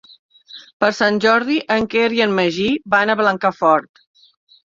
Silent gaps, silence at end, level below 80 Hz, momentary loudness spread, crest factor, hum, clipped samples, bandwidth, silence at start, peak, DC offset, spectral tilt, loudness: 0.73-0.80 s; 0.95 s; -56 dBFS; 4 LU; 16 dB; none; under 0.1%; 7.6 kHz; 0.55 s; -2 dBFS; under 0.1%; -5 dB/octave; -16 LUFS